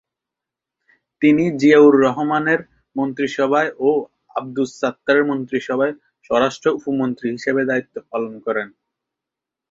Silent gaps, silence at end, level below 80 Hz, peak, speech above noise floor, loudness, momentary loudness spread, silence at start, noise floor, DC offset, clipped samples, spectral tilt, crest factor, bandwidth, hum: none; 1.05 s; -62 dBFS; -2 dBFS; 68 dB; -18 LUFS; 12 LU; 1.2 s; -85 dBFS; under 0.1%; under 0.1%; -6 dB/octave; 18 dB; 7.6 kHz; none